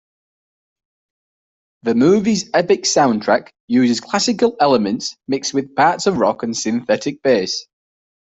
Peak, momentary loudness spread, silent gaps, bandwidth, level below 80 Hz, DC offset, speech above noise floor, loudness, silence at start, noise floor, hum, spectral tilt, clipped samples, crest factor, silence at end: -2 dBFS; 8 LU; 3.60-3.68 s; 8.4 kHz; -58 dBFS; under 0.1%; over 74 dB; -17 LUFS; 1.85 s; under -90 dBFS; none; -4 dB/octave; under 0.1%; 16 dB; 0.7 s